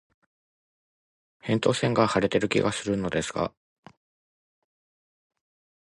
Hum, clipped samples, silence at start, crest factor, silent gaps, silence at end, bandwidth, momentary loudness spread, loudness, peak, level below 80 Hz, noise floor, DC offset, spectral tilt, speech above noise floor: none; under 0.1%; 1.45 s; 22 dB; none; 2.4 s; 11.5 kHz; 8 LU; -26 LUFS; -6 dBFS; -56 dBFS; under -90 dBFS; under 0.1%; -5 dB/octave; over 65 dB